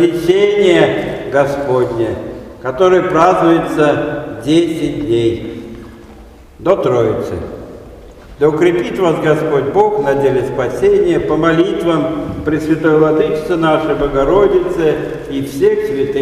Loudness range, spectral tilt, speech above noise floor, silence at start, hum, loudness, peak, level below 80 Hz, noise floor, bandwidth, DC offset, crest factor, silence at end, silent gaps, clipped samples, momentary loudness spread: 4 LU; -6.5 dB/octave; 24 dB; 0 s; none; -13 LUFS; 0 dBFS; -38 dBFS; -37 dBFS; 13.5 kHz; under 0.1%; 14 dB; 0 s; none; under 0.1%; 11 LU